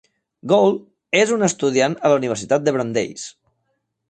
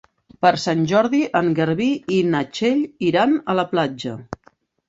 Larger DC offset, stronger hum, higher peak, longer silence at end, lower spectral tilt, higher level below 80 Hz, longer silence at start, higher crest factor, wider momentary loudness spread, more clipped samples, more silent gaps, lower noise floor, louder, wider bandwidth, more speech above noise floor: neither; neither; about the same, -2 dBFS vs -2 dBFS; first, 0.8 s vs 0.55 s; second, -4.5 dB/octave vs -6 dB/octave; about the same, -62 dBFS vs -58 dBFS; about the same, 0.45 s vs 0.4 s; about the same, 18 dB vs 18 dB; about the same, 13 LU vs 12 LU; neither; neither; first, -72 dBFS vs -57 dBFS; about the same, -19 LUFS vs -19 LUFS; first, 9 kHz vs 8 kHz; first, 54 dB vs 38 dB